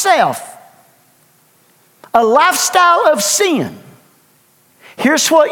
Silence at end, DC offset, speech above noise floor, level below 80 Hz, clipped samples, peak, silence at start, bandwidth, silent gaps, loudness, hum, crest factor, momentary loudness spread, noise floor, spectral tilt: 0 s; under 0.1%; 41 dB; -64 dBFS; under 0.1%; 0 dBFS; 0 s; 18.5 kHz; none; -12 LUFS; none; 14 dB; 11 LU; -53 dBFS; -2 dB/octave